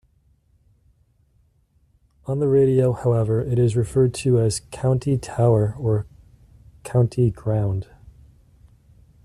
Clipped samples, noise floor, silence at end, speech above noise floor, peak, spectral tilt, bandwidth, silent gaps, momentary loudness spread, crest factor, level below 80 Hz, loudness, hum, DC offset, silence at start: under 0.1%; -62 dBFS; 1.4 s; 42 dB; -6 dBFS; -7.5 dB/octave; 12 kHz; none; 9 LU; 16 dB; -46 dBFS; -21 LUFS; none; under 0.1%; 2.25 s